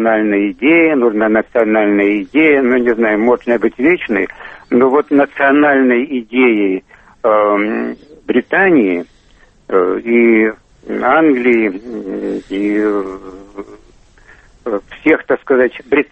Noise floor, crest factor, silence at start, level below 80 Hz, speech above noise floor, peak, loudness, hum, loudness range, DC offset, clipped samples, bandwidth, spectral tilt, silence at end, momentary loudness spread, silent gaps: -47 dBFS; 14 dB; 0 s; -50 dBFS; 35 dB; 0 dBFS; -13 LUFS; none; 6 LU; under 0.1%; under 0.1%; 4.8 kHz; -7.5 dB/octave; 0.05 s; 13 LU; none